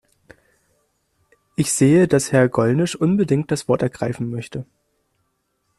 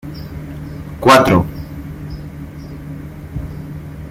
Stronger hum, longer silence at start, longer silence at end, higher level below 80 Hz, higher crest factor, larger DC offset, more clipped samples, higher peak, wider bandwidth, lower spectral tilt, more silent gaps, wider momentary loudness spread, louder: neither; first, 1.6 s vs 0.05 s; first, 1.15 s vs 0 s; second, -54 dBFS vs -36 dBFS; about the same, 18 dB vs 18 dB; neither; neither; second, -4 dBFS vs 0 dBFS; second, 13.5 kHz vs 16.5 kHz; about the same, -6 dB/octave vs -5.5 dB/octave; neither; second, 14 LU vs 21 LU; second, -19 LUFS vs -13 LUFS